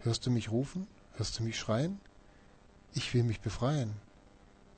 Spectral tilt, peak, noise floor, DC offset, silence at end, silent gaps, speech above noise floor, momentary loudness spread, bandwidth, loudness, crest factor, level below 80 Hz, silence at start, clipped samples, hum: -5.5 dB/octave; -18 dBFS; -60 dBFS; under 0.1%; 0.4 s; none; 27 dB; 11 LU; 9 kHz; -34 LUFS; 16 dB; -54 dBFS; 0 s; under 0.1%; none